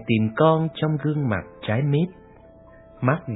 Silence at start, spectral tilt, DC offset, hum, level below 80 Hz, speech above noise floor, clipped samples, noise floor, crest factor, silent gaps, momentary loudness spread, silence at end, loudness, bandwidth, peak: 0 s; -11.5 dB/octave; under 0.1%; none; -54 dBFS; 26 dB; under 0.1%; -48 dBFS; 20 dB; none; 8 LU; 0 s; -23 LUFS; 4 kHz; -2 dBFS